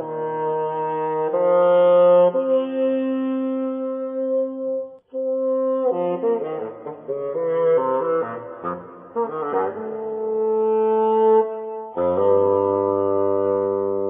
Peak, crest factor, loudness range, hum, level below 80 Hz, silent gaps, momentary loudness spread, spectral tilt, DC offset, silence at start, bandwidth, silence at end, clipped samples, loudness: -6 dBFS; 14 dB; 5 LU; none; -70 dBFS; none; 13 LU; -11 dB/octave; under 0.1%; 0 s; 3.6 kHz; 0 s; under 0.1%; -21 LUFS